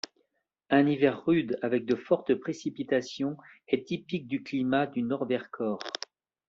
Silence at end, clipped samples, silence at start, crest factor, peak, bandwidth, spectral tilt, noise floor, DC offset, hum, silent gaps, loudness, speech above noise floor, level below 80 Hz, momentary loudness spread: 0.55 s; under 0.1%; 0.7 s; 20 dB; -10 dBFS; 7.6 kHz; -5 dB/octave; -77 dBFS; under 0.1%; none; none; -29 LUFS; 49 dB; -70 dBFS; 10 LU